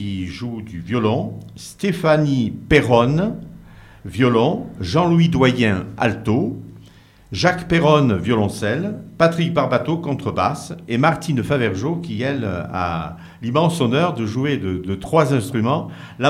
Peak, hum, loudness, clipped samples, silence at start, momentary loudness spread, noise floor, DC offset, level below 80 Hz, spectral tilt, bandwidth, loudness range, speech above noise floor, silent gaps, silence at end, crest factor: 0 dBFS; none; -19 LUFS; under 0.1%; 0 s; 12 LU; -46 dBFS; under 0.1%; -46 dBFS; -6.5 dB/octave; 13.5 kHz; 3 LU; 28 dB; none; 0 s; 18 dB